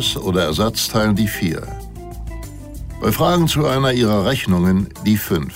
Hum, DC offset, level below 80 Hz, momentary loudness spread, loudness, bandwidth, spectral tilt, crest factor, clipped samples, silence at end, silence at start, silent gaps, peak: none; under 0.1%; -34 dBFS; 17 LU; -17 LUFS; 16.5 kHz; -5.5 dB/octave; 14 dB; under 0.1%; 0 s; 0 s; none; -4 dBFS